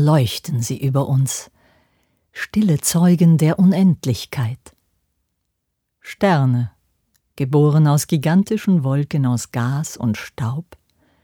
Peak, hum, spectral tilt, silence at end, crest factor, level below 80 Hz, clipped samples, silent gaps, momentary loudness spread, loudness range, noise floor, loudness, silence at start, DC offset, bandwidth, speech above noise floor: -4 dBFS; none; -6.5 dB/octave; 0.6 s; 14 dB; -56 dBFS; under 0.1%; none; 12 LU; 4 LU; -75 dBFS; -18 LUFS; 0 s; under 0.1%; 20 kHz; 58 dB